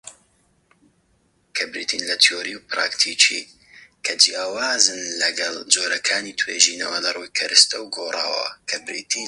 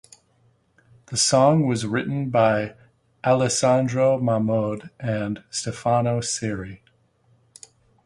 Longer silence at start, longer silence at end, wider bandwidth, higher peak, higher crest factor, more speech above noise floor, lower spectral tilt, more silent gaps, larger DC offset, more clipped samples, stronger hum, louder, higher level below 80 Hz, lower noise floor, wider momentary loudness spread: second, 0.05 s vs 1.1 s; second, 0 s vs 1.3 s; first, 16 kHz vs 11.5 kHz; first, 0 dBFS vs -4 dBFS; about the same, 22 dB vs 18 dB; about the same, 42 dB vs 41 dB; second, 2 dB/octave vs -5 dB/octave; neither; neither; neither; neither; first, -19 LUFS vs -22 LUFS; second, -70 dBFS vs -56 dBFS; about the same, -63 dBFS vs -62 dBFS; about the same, 11 LU vs 11 LU